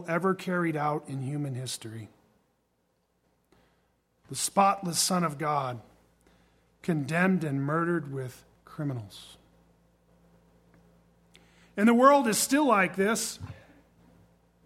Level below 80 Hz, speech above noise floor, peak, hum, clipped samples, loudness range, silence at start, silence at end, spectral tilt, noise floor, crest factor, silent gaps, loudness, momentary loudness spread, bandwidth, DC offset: -68 dBFS; 46 dB; -6 dBFS; none; under 0.1%; 14 LU; 0 s; 1.1 s; -4.5 dB/octave; -73 dBFS; 24 dB; none; -27 LUFS; 18 LU; 16.5 kHz; under 0.1%